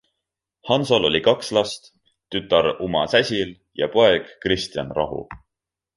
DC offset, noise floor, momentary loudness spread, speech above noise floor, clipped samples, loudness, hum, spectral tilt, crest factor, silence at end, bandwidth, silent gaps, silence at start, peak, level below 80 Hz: under 0.1%; -86 dBFS; 12 LU; 65 dB; under 0.1%; -21 LUFS; none; -4.5 dB/octave; 20 dB; 0.6 s; 11.5 kHz; none; 0.65 s; -2 dBFS; -50 dBFS